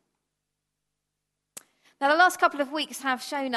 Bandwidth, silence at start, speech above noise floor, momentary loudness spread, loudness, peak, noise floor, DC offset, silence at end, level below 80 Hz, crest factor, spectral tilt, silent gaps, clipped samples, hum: 13 kHz; 2 s; 58 dB; 9 LU; -24 LUFS; -8 dBFS; -83 dBFS; under 0.1%; 0 s; -86 dBFS; 20 dB; -1 dB/octave; none; under 0.1%; 50 Hz at -85 dBFS